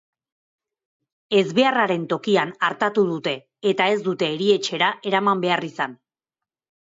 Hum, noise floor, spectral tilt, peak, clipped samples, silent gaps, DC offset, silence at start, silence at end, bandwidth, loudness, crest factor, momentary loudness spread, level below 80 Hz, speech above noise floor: none; -89 dBFS; -5 dB/octave; -6 dBFS; under 0.1%; none; under 0.1%; 1.3 s; 0.9 s; 7.8 kHz; -21 LUFS; 16 dB; 7 LU; -72 dBFS; 68 dB